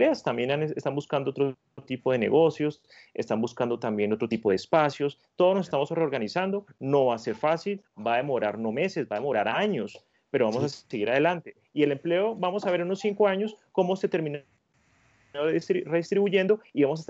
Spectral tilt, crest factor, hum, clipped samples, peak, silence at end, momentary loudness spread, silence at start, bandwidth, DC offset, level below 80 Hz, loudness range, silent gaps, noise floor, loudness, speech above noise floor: -6.5 dB/octave; 18 dB; none; under 0.1%; -10 dBFS; 0.05 s; 8 LU; 0 s; 8 kHz; under 0.1%; -72 dBFS; 2 LU; none; -66 dBFS; -27 LUFS; 40 dB